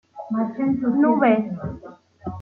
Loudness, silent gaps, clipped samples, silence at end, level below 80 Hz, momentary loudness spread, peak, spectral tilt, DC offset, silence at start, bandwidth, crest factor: -21 LUFS; none; under 0.1%; 0 s; -54 dBFS; 18 LU; -4 dBFS; -10 dB/octave; under 0.1%; 0.15 s; 3.9 kHz; 18 dB